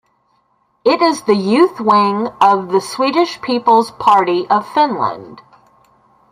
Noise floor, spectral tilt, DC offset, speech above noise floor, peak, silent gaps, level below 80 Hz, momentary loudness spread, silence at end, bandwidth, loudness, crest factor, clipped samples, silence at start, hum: -61 dBFS; -5 dB/octave; under 0.1%; 47 dB; 0 dBFS; none; -62 dBFS; 6 LU; 0.9 s; 15 kHz; -14 LUFS; 14 dB; under 0.1%; 0.85 s; none